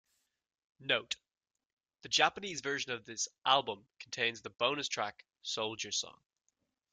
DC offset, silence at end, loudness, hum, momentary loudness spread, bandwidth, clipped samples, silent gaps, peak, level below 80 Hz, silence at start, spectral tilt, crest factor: under 0.1%; 0.8 s; -34 LUFS; none; 14 LU; 10.5 kHz; under 0.1%; 1.66-1.77 s; -10 dBFS; -80 dBFS; 0.8 s; -1 dB/octave; 26 dB